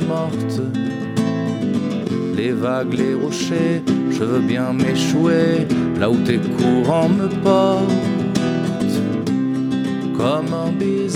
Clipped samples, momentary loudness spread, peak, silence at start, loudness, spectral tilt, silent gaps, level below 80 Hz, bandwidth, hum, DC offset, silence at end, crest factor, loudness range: under 0.1%; 6 LU; -2 dBFS; 0 s; -19 LUFS; -6.5 dB/octave; none; -54 dBFS; 15 kHz; none; under 0.1%; 0 s; 16 dB; 4 LU